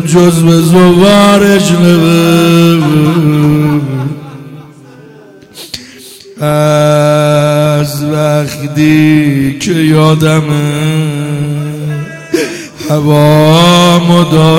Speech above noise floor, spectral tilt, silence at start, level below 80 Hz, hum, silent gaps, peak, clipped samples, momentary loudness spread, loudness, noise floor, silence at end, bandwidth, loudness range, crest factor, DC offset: 28 dB; -6 dB/octave; 0 s; -40 dBFS; none; none; 0 dBFS; 0.6%; 13 LU; -8 LUFS; -35 dBFS; 0 s; 16.5 kHz; 7 LU; 8 dB; under 0.1%